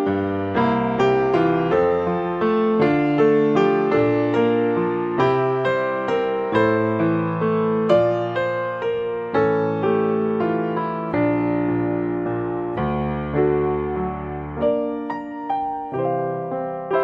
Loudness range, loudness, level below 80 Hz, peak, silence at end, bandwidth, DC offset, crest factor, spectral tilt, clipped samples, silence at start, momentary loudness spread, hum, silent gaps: 5 LU; -21 LUFS; -46 dBFS; -4 dBFS; 0 s; 7.2 kHz; under 0.1%; 16 dB; -8.5 dB/octave; under 0.1%; 0 s; 7 LU; none; none